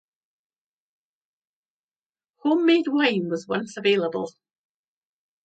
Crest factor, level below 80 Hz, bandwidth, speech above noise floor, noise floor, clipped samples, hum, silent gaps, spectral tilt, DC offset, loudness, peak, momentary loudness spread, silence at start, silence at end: 20 dB; -78 dBFS; 9 kHz; over 68 dB; under -90 dBFS; under 0.1%; none; none; -5.5 dB/octave; under 0.1%; -23 LUFS; -6 dBFS; 10 LU; 2.45 s; 1.15 s